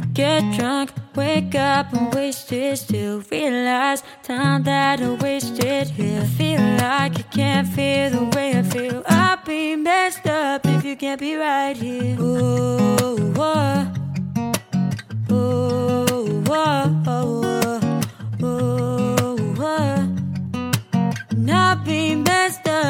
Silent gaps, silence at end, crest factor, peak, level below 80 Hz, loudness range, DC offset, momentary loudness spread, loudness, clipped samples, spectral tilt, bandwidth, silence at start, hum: none; 0 s; 18 dB; -2 dBFS; -56 dBFS; 2 LU; under 0.1%; 7 LU; -20 LUFS; under 0.1%; -5.5 dB/octave; 17 kHz; 0 s; none